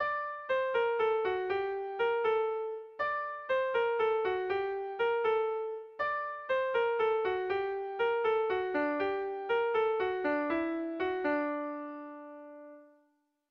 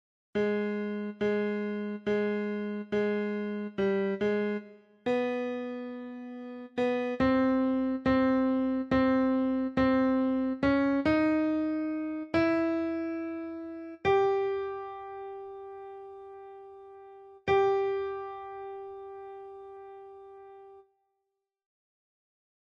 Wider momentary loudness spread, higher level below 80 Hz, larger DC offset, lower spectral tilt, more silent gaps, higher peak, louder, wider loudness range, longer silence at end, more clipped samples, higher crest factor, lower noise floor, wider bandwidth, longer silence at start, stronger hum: second, 8 LU vs 20 LU; second, -70 dBFS vs -58 dBFS; neither; second, -6 dB/octave vs -7.5 dB/octave; neither; second, -20 dBFS vs -14 dBFS; second, -32 LUFS vs -29 LUFS; second, 2 LU vs 10 LU; second, 0.65 s vs 1.95 s; neither; second, 12 dB vs 18 dB; second, -74 dBFS vs -84 dBFS; second, 5.6 kHz vs 7 kHz; second, 0 s vs 0.35 s; neither